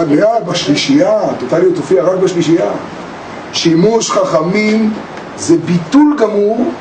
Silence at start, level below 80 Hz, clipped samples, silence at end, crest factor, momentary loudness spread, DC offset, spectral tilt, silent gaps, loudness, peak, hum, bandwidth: 0 s; -52 dBFS; under 0.1%; 0 s; 12 dB; 12 LU; under 0.1%; -5 dB/octave; none; -12 LUFS; 0 dBFS; none; 9.4 kHz